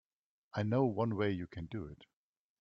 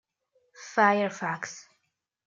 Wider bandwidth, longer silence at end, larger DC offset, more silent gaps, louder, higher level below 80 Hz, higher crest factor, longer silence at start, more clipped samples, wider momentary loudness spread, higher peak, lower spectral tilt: about the same, 7 kHz vs 7.6 kHz; about the same, 0.55 s vs 0.65 s; neither; neither; second, -36 LUFS vs -26 LUFS; first, -66 dBFS vs -82 dBFS; about the same, 18 dB vs 22 dB; about the same, 0.55 s vs 0.6 s; neither; second, 12 LU vs 22 LU; second, -20 dBFS vs -8 dBFS; first, -9 dB/octave vs -4.5 dB/octave